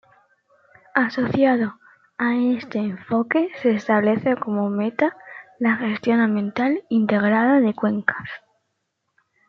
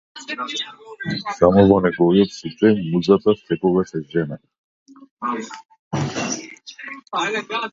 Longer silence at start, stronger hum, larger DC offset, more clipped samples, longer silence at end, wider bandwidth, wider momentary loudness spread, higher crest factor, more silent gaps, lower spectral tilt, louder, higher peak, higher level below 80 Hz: first, 0.95 s vs 0.15 s; neither; neither; neither; first, 1.1 s vs 0.05 s; second, 6.4 kHz vs 7.8 kHz; second, 8 LU vs 17 LU; about the same, 20 dB vs 20 dB; second, none vs 4.58-4.86 s, 5.11-5.17 s, 5.79-5.91 s; first, -8 dB/octave vs -6 dB/octave; about the same, -21 LUFS vs -20 LUFS; about the same, -2 dBFS vs 0 dBFS; second, -66 dBFS vs -48 dBFS